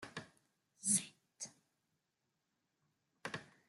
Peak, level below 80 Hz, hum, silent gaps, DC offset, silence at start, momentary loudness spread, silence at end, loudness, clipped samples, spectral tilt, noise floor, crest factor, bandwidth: -20 dBFS; -86 dBFS; none; none; under 0.1%; 0 s; 17 LU; 0.25 s; -38 LUFS; under 0.1%; -1.5 dB/octave; -87 dBFS; 28 dB; 12.5 kHz